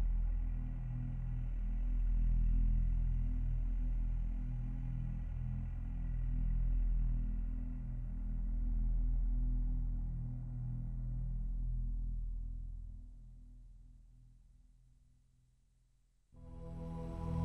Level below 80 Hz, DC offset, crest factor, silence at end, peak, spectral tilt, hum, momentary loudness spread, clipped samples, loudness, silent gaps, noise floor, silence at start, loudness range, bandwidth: -38 dBFS; under 0.1%; 10 dB; 0 s; -26 dBFS; -10 dB/octave; none; 12 LU; under 0.1%; -41 LUFS; none; -72 dBFS; 0 s; 13 LU; 2.5 kHz